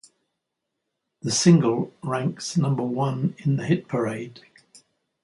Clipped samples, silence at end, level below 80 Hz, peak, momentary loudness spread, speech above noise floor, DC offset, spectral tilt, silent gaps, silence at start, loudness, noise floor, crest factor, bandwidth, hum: under 0.1%; 0.85 s; -66 dBFS; -6 dBFS; 12 LU; 59 dB; under 0.1%; -5.5 dB/octave; none; 1.25 s; -23 LUFS; -81 dBFS; 20 dB; 11.5 kHz; none